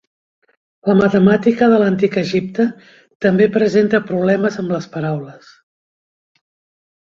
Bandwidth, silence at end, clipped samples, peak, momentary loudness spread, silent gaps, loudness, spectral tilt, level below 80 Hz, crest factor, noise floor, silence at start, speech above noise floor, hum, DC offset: 7.4 kHz; 1.7 s; under 0.1%; 0 dBFS; 10 LU; 3.15-3.20 s; -16 LUFS; -7.5 dB/octave; -56 dBFS; 16 dB; under -90 dBFS; 0.85 s; over 75 dB; none; under 0.1%